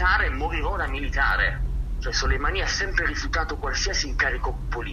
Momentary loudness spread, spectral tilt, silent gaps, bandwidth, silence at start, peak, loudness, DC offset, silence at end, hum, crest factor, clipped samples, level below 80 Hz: 8 LU; -3.5 dB/octave; none; 7.2 kHz; 0 s; -8 dBFS; -25 LUFS; under 0.1%; 0 s; none; 16 dB; under 0.1%; -28 dBFS